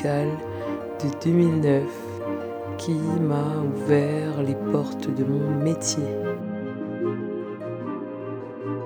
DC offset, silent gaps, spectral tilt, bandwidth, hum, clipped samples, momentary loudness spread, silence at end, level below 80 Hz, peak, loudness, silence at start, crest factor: under 0.1%; none; -6.5 dB/octave; 19.5 kHz; none; under 0.1%; 11 LU; 0 s; -64 dBFS; -6 dBFS; -26 LUFS; 0 s; 18 dB